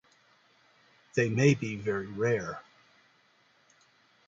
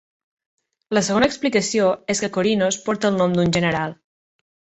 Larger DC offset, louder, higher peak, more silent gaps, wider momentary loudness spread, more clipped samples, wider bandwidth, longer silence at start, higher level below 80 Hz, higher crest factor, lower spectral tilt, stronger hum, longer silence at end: neither; second, -29 LUFS vs -20 LUFS; second, -10 dBFS vs -4 dBFS; neither; first, 11 LU vs 4 LU; neither; about the same, 7.8 kHz vs 8.4 kHz; first, 1.15 s vs 0.9 s; second, -66 dBFS vs -52 dBFS; about the same, 22 dB vs 18 dB; first, -6.5 dB/octave vs -4.5 dB/octave; neither; first, 1.65 s vs 0.85 s